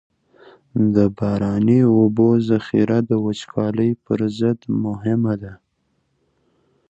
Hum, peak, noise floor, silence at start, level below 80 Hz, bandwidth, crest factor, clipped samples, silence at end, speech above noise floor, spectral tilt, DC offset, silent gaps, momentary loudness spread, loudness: none; -2 dBFS; -68 dBFS; 0.75 s; -50 dBFS; 8 kHz; 16 dB; under 0.1%; 1.35 s; 50 dB; -9 dB/octave; under 0.1%; none; 8 LU; -19 LUFS